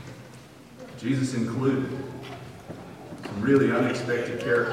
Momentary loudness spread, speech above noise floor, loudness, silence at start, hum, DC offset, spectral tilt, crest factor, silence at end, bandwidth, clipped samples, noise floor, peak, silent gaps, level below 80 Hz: 22 LU; 22 dB; -26 LUFS; 0 s; none; under 0.1%; -6.5 dB/octave; 18 dB; 0 s; 14 kHz; under 0.1%; -47 dBFS; -8 dBFS; none; -60 dBFS